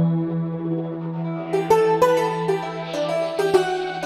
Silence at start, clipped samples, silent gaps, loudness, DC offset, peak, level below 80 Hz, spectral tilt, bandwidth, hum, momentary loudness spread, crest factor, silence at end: 0 s; under 0.1%; none; -22 LUFS; under 0.1%; -2 dBFS; -60 dBFS; -6.5 dB/octave; 14.5 kHz; none; 10 LU; 18 dB; 0 s